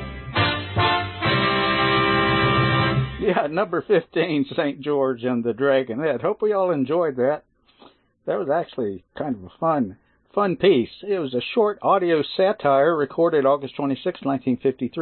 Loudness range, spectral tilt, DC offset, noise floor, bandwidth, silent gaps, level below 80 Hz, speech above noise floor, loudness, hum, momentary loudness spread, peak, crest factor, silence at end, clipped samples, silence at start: 5 LU; -11 dB/octave; under 0.1%; -53 dBFS; 4.4 kHz; none; -48 dBFS; 32 dB; -22 LUFS; none; 8 LU; -6 dBFS; 16 dB; 0 s; under 0.1%; 0 s